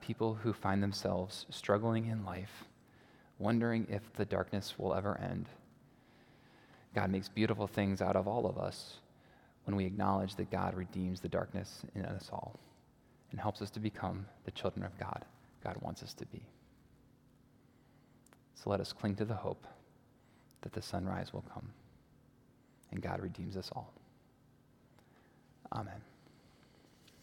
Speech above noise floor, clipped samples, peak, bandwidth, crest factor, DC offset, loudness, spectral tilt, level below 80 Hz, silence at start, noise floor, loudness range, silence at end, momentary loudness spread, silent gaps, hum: 29 dB; under 0.1%; -14 dBFS; 17 kHz; 26 dB; under 0.1%; -39 LUFS; -6.5 dB/octave; -70 dBFS; 0 s; -67 dBFS; 10 LU; 1.15 s; 16 LU; none; none